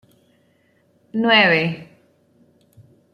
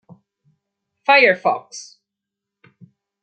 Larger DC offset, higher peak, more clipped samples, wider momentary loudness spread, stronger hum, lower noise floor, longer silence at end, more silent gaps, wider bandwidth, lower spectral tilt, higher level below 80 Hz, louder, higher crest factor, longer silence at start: neither; about the same, -2 dBFS vs 0 dBFS; neither; second, 17 LU vs 24 LU; neither; second, -61 dBFS vs -84 dBFS; about the same, 1.3 s vs 1.4 s; neither; first, 10 kHz vs 9 kHz; first, -6.5 dB/octave vs -3 dB/octave; first, -68 dBFS vs -74 dBFS; about the same, -16 LUFS vs -16 LUFS; about the same, 20 dB vs 22 dB; about the same, 1.15 s vs 1.1 s